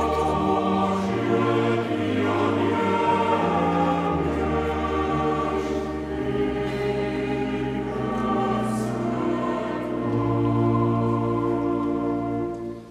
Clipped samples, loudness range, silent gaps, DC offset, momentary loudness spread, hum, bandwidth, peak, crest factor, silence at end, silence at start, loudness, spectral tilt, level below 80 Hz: under 0.1%; 3 LU; none; under 0.1%; 6 LU; none; 13 kHz; -10 dBFS; 14 dB; 0 s; 0 s; -24 LUFS; -7.5 dB/octave; -42 dBFS